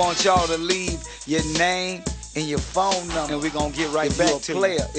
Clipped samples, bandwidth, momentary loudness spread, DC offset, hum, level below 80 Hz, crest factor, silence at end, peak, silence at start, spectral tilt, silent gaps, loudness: under 0.1%; 9.2 kHz; 9 LU; under 0.1%; none; -38 dBFS; 18 dB; 0 s; -4 dBFS; 0 s; -3.5 dB/octave; none; -23 LUFS